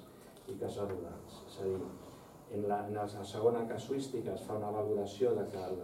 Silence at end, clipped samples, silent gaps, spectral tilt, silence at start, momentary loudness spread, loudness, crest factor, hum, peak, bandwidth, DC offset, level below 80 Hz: 0 s; under 0.1%; none; -6.5 dB/octave; 0 s; 17 LU; -38 LUFS; 20 dB; none; -18 dBFS; 16.5 kHz; under 0.1%; -70 dBFS